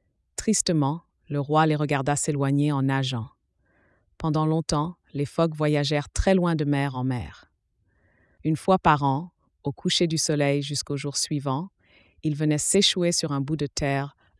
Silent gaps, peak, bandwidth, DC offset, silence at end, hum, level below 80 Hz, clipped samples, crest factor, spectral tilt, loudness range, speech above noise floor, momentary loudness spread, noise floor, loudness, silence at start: none; -6 dBFS; 12 kHz; under 0.1%; 0.3 s; none; -46 dBFS; under 0.1%; 18 dB; -4.5 dB/octave; 2 LU; 46 dB; 11 LU; -70 dBFS; -25 LUFS; 0.4 s